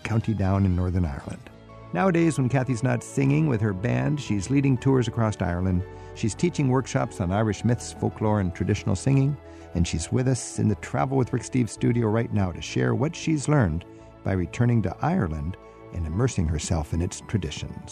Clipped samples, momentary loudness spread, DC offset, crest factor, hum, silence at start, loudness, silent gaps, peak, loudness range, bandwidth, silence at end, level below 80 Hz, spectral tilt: under 0.1%; 8 LU; under 0.1%; 16 dB; none; 0.05 s; -25 LUFS; none; -10 dBFS; 2 LU; 11.5 kHz; 0 s; -42 dBFS; -6.5 dB/octave